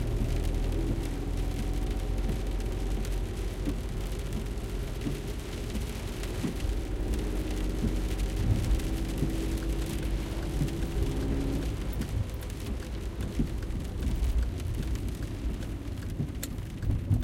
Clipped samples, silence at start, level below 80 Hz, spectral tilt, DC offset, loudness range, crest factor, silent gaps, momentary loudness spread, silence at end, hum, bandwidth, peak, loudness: under 0.1%; 0 s; -32 dBFS; -6.5 dB/octave; under 0.1%; 3 LU; 16 dB; none; 5 LU; 0 s; none; 16.5 kHz; -14 dBFS; -33 LUFS